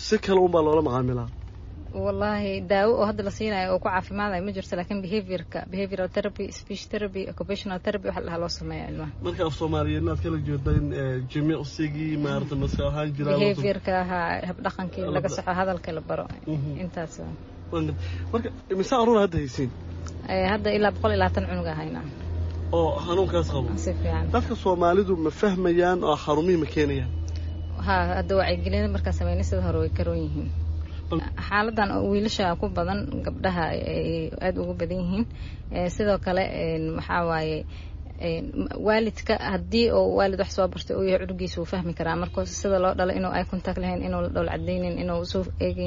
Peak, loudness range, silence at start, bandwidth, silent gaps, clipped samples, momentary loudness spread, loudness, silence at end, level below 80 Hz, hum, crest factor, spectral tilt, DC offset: -8 dBFS; 6 LU; 0 s; 7.4 kHz; none; under 0.1%; 10 LU; -26 LUFS; 0 s; -38 dBFS; none; 18 dB; -5.5 dB/octave; under 0.1%